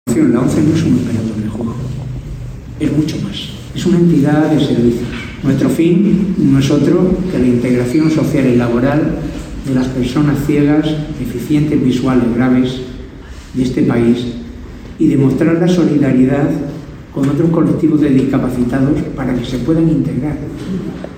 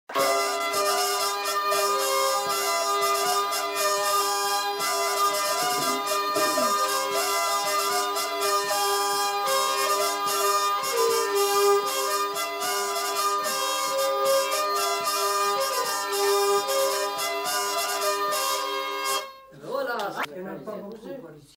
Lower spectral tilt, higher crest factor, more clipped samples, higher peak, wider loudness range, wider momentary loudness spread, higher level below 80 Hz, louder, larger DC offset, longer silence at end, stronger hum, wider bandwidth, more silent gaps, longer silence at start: first, -7.5 dB/octave vs 0 dB/octave; about the same, 12 dB vs 14 dB; neither; first, 0 dBFS vs -10 dBFS; about the same, 3 LU vs 3 LU; first, 13 LU vs 6 LU; first, -34 dBFS vs -72 dBFS; first, -14 LUFS vs -24 LUFS; neither; second, 0 s vs 0.15 s; neither; about the same, 16 kHz vs 16 kHz; neither; about the same, 0.05 s vs 0.1 s